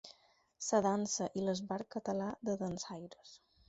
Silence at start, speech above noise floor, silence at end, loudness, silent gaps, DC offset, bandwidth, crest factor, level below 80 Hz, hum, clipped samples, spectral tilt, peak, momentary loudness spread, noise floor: 0.05 s; 32 dB; 0.3 s; -37 LUFS; none; under 0.1%; 8 kHz; 20 dB; -72 dBFS; none; under 0.1%; -5.5 dB/octave; -18 dBFS; 17 LU; -69 dBFS